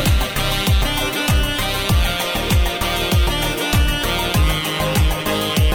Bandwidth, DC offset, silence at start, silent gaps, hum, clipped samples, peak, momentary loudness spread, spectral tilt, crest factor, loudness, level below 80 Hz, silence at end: over 20 kHz; 0.2%; 0 s; none; none; under 0.1%; -6 dBFS; 2 LU; -4 dB/octave; 12 dB; -18 LUFS; -22 dBFS; 0 s